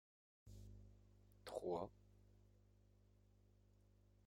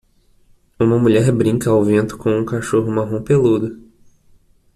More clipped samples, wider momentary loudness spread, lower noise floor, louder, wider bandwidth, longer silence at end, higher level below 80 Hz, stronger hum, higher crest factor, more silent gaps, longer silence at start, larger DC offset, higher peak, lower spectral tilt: neither; first, 19 LU vs 6 LU; first, -73 dBFS vs -53 dBFS; second, -51 LUFS vs -17 LUFS; first, 16 kHz vs 13.5 kHz; first, 1.8 s vs 0.95 s; second, -72 dBFS vs -46 dBFS; first, 50 Hz at -70 dBFS vs none; first, 24 dB vs 14 dB; neither; second, 0.45 s vs 0.8 s; neither; second, -34 dBFS vs -4 dBFS; about the same, -6.5 dB/octave vs -7.5 dB/octave